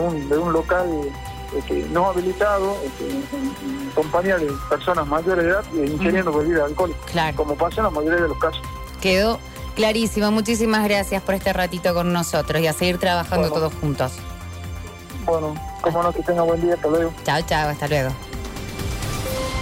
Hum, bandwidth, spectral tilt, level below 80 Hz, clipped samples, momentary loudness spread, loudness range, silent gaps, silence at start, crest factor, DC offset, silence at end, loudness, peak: none; 16 kHz; -5 dB/octave; -36 dBFS; under 0.1%; 10 LU; 3 LU; none; 0 s; 12 dB; under 0.1%; 0 s; -21 LUFS; -8 dBFS